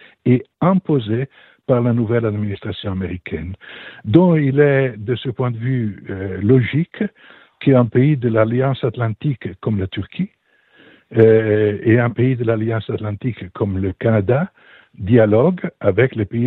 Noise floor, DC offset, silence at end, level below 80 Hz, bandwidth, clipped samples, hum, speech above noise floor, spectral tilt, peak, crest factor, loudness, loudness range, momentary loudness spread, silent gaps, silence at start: -52 dBFS; under 0.1%; 0 s; -50 dBFS; 4.1 kHz; under 0.1%; none; 35 dB; -11.5 dB/octave; 0 dBFS; 18 dB; -18 LUFS; 3 LU; 12 LU; none; 0.25 s